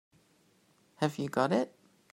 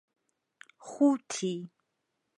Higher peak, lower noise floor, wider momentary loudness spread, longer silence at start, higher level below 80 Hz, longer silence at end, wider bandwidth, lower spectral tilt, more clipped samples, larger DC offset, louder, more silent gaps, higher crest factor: about the same, -12 dBFS vs -14 dBFS; second, -68 dBFS vs -81 dBFS; second, 6 LU vs 23 LU; first, 1 s vs 0.85 s; first, -78 dBFS vs -88 dBFS; second, 0.45 s vs 0.7 s; first, 16 kHz vs 11.5 kHz; about the same, -6 dB/octave vs -5 dB/octave; neither; neither; about the same, -32 LUFS vs -30 LUFS; neither; about the same, 22 dB vs 20 dB